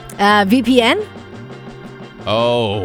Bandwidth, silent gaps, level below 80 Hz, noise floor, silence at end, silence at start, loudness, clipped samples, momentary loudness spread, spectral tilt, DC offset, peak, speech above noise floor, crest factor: over 20 kHz; none; -50 dBFS; -34 dBFS; 0 s; 0 s; -14 LUFS; under 0.1%; 22 LU; -5 dB/octave; under 0.1%; 0 dBFS; 20 dB; 16 dB